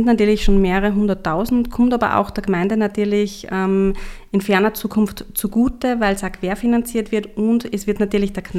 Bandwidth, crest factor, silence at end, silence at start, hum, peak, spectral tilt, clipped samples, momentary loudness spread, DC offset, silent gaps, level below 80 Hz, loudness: 15.5 kHz; 16 dB; 0 s; 0 s; none; 0 dBFS; -6 dB/octave; under 0.1%; 7 LU; under 0.1%; none; -30 dBFS; -19 LUFS